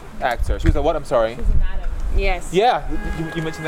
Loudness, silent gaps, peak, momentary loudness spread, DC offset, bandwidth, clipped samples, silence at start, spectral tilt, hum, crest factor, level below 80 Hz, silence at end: -22 LUFS; none; -4 dBFS; 9 LU; under 0.1%; 12.5 kHz; under 0.1%; 0 s; -6 dB/octave; none; 14 dB; -22 dBFS; 0 s